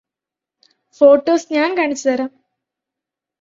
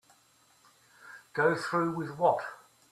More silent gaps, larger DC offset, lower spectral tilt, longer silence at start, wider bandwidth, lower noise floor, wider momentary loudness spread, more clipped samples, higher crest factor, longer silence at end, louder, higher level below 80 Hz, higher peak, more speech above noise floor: neither; neither; second, -3 dB/octave vs -6 dB/octave; about the same, 1 s vs 1.05 s; second, 7.6 kHz vs 14 kHz; first, -87 dBFS vs -65 dBFS; second, 10 LU vs 18 LU; neither; about the same, 18 dB vs 20 dB; first, 1.15 s vs 0.35 s; first, -15 LUFS vs -30 LUFS; first, -64 dBFS vs -74 dBFS; first, 0 dBFS vs -12 dBFS; first, 72 dB vs 36 dB